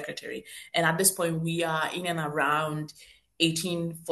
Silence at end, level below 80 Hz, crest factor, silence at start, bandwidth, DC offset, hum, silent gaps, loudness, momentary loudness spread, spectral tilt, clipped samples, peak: 0 s; -66 dBFS; 22 dB; 0 s; 13 kHz; under 0.1%; none; none; -27 LUFS; 14 LU; -3.5 dB/octave; under 0.1%; -8 dBFS